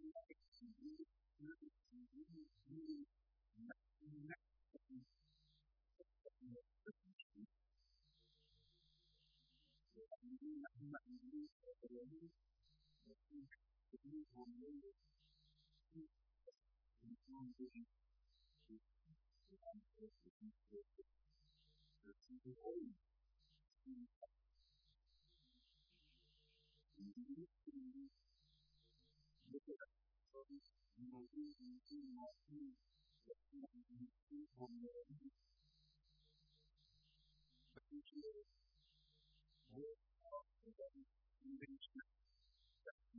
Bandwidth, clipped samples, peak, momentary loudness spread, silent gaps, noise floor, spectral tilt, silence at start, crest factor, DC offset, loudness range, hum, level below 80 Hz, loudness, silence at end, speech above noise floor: 5.4 kHz; under 0.1%; -42 dBFS; 10 LU; 0.48-0.52 s, 7.13-7.30 s, 11.52-11.60 s, 20.30-20.40 s, 24.16-24.21 s, 34.22-34.27 s, 42.91-42.98 s; -83 dBFS; -5.5 dB/octave; 0 s; 20 dB; under 0.1%; 6 LU; none; -82 dBFS; -60 LUFS; 0 s; 24 dB